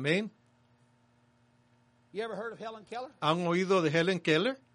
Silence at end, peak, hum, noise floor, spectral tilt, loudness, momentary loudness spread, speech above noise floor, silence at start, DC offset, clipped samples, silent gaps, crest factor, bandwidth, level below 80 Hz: 0.2 s; -12 dBFS; none; -67 dBFS; -5.5 dB/octave; -30 LUFS; 15 LU; 37 dB; 0 s; under 0.1%; under 0.1%; none; 20 dB; 10.5 kHz; -78 dBFS